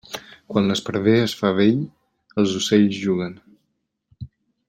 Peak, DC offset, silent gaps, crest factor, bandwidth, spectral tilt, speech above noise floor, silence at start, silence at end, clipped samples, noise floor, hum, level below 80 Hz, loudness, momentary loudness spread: -4 dBFS; under 0.1%; none; 18 dB; 16 kHz; -5.5 dB/octave; 55 dB; 0.1 s; 0.45 s; under 0.1%; -74 dBFS; none; -58 dBFS; -20 LUFS; 20 LU